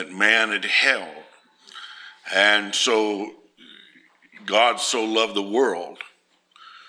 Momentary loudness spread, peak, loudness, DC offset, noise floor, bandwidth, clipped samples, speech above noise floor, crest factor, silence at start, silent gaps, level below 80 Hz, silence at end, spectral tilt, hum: 22 LU; -2 dBFS; -20 LUFS; under 0.1%; -59 dBFS; 15.5 kHz; under 0.1%; 37 dB; 22 dB; 0 s; none; -84 dBFS; 0.1 s; -1 dB/octave; none